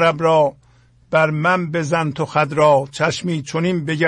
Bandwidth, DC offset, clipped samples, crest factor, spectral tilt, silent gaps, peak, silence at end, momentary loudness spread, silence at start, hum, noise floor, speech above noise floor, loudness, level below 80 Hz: 10.5 kHz; under 0.1%; under 0.1%; 14 dB; -6 dB/octave; none; -2 dBFS; 0 s; 6 LU; 0 s; none; -52 dBFS; 35 dB; -18 LUFS; -56 dBFS